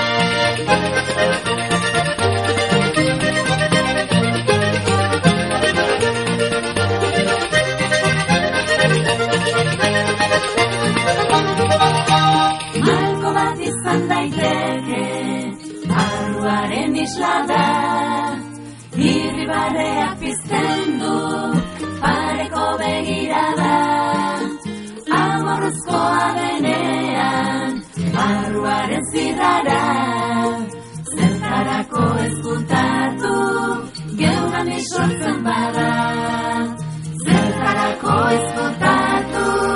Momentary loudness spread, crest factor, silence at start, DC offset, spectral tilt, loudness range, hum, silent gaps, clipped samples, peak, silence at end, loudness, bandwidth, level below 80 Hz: 6 LU; 16 dB; 0 s; under 0.1%; -4.5 dB/octave; 4 LU; none; none; under 0.1%; -2 dBFS; 0 s; -18 LUFS; 11.5 kHz; -46 dBFS